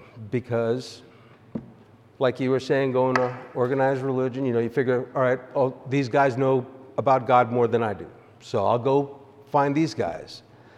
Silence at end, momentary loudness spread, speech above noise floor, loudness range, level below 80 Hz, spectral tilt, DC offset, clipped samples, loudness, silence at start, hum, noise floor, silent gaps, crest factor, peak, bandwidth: 0.4 s; 15 LU; 29 dB; 3 LU; -66 dBFS; -7 dB/octave; under 0.1%; under 0.1%; -24 LUFS; 0 s; none; -52 dBFS; none; 18 dB; -6 dBFS; 11 kHz